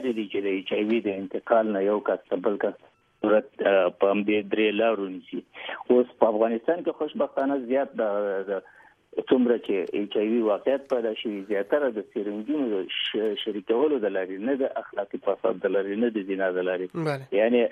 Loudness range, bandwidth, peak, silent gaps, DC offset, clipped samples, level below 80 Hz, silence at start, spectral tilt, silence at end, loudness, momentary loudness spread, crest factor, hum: 3 LU; 9.2 kHz; -4 dBFS; none; under 0.1%; under 0.1%; -72 dBFS; 0 s; -7.5 dB/octave; 0 s; -26 LUFS; 9 LU; 22 dB; none